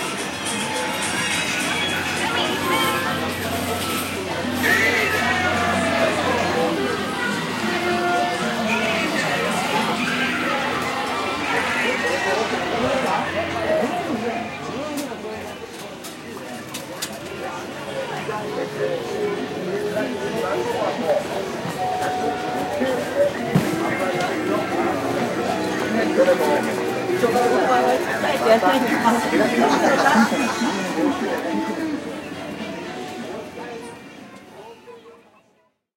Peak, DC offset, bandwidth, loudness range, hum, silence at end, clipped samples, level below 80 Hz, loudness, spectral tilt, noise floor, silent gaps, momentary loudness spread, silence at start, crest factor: -4 dBFS; under 0.1%; 16 kHz; 11 LU; none; 0.8 s; under 0.1%; -56 dBFS; -21 LUFS; -4 dB/octave; -63 dBFS; none; 13 LU; 0 s; 18 dB